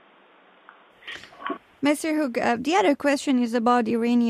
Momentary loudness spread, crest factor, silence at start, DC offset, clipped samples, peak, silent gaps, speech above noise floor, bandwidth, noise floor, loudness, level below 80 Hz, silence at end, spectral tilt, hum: 17 LU; 16 dB; 1.05 s; under 0.1%; under 0.1%; -8 dBFS; none; 34 dB; 14.5 kHz; -55 dBFS; -23 LUFS; -68 dBFS; 0 s; -4 dB/octave; none